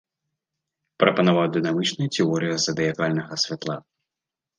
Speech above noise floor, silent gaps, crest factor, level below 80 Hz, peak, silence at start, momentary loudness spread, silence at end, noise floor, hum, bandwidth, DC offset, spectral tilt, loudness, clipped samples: 65 dB; none; 22 dB; -66 dBFS; -2 dBFS; 1 s; 6 LU; 0.8 s; -88 dBFS; none; 9.8 kHz; under 0.1%; -4.5 dB/octave; -23 LUFS; under 0.1%